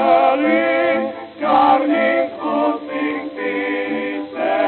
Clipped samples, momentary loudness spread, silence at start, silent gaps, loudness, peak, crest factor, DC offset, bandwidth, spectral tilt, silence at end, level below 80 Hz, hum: under 0.1%; 9 LU; 0 s; none; -18 LUFS; -4 dBFS; 14 dB; under 0.1%; 4.5 kHz; -8.5 dB/octave; 0 s; -62 dBFS; none